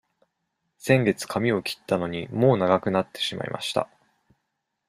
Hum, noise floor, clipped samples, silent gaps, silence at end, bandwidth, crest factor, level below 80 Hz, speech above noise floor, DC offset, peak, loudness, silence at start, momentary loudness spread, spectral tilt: none; -79 dBFS; under 0.1%; none; 1.05 s; 15.5 kHz; 22 dB; -62 dBFS; 55 dB; under 0.1%; -4 dBFS; -24 LUFS; 0.85 s; 9 LU; -5.5 dB/octave